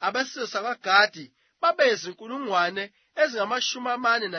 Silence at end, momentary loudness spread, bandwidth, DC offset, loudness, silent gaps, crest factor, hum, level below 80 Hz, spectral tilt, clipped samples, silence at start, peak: 0 s; 14 LU; 6.6 kHz; under 0.1%; -24 LUFS; none; 20 dB; none; -84 dBFS; -2 dB/octave; under 0.1%; 0 s; -4 dBFS